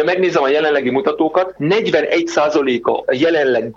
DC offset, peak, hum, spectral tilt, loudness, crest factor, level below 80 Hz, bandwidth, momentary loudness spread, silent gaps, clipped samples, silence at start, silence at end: under 0.1%; -2 dBFS; none; -5 dB/octave; -15 LUFS; 12 dB; -56 dBFS; 7.8 kHz; 3 LU; none; under 0.1%; 0 s; 0.05 s